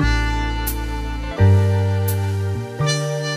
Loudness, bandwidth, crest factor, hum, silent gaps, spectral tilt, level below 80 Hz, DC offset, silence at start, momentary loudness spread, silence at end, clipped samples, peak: -20 LUFS; 15.5 kHz; 14 dB; none; none; -5.5 dB/octave; -26 dBFS; under 0.1%; 0 s; 11 LU; 0 s; under 0.1%; -4 dBFS